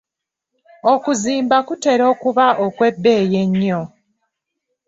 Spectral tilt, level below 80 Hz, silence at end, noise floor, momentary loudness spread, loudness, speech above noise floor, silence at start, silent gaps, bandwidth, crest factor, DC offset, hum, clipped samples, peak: -5.5 dB/octave; -60 dBFS; 1 s; -83 dBFS; 6 LU; -16 LUFS; 68 dB; 0.85 s; none; 8 kHz; 14 dB; under 0.1%; none; under 0.1%; -2 dBFS